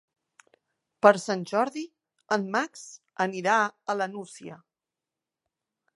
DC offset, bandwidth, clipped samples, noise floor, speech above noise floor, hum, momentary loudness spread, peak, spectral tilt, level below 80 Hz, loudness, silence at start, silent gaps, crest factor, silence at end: under 0.1%; 11.5 kHz; under 0.1%; -89 dBFS; 63 dB; none; 22 LU; -2 dBFS; -4.5 dB/octave; -82 dBFS; -26 LUFS; 1.05 s; none; 26 dB; 1.4 s